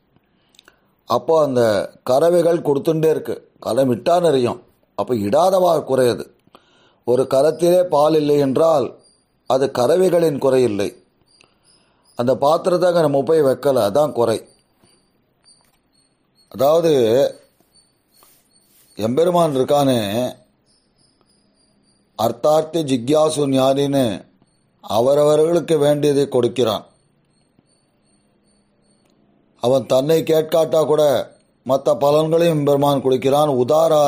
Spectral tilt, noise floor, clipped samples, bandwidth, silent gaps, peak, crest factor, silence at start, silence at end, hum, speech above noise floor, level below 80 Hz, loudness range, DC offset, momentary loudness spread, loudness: -6 dB/octave; -61 dBFS; under 0.1%; 15.5 kHz; none; -4 dBFS; 14 dB; 1.1 s; 0 s; none; 46 dB; -60 dBFS; 5 LU; under 0.1%; 9 LU; -17 LUFS